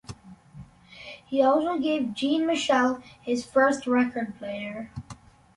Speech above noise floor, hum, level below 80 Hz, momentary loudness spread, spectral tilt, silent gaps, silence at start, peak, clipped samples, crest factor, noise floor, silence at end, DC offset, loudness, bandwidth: 23 dB; none; -60 dBFS; 20 LU; -4.5 dB/octave; none; 0.1 s; -10 dBFS; under 0.1%; 18 dB; -48 dBFS; 0.4 s; under 0.1%; -25 LUFS; 11.5 kHz